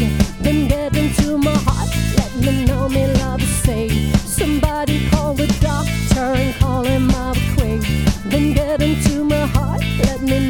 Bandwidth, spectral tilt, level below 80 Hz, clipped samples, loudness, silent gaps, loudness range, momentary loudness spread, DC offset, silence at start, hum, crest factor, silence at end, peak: 18.5 kHz; -5.5 dB/octave; -24 dBFS; under 0.1%; -17 LUFS; none; 0 LU; 2 LU; under 0.1%; 0 s; none; 14 dB; 0 s; -2 dBFS